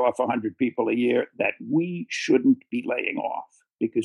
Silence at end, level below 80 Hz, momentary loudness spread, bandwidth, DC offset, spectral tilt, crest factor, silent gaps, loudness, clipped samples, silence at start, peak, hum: 0 s; -78 dBFS; 9 LU; 10.5 kHz; under 0.1%; -6 dB/octave; 16 dB; 3.73-3.77 s; -25 LUFS; under 0.1%; 0 s; -8 dBFS; none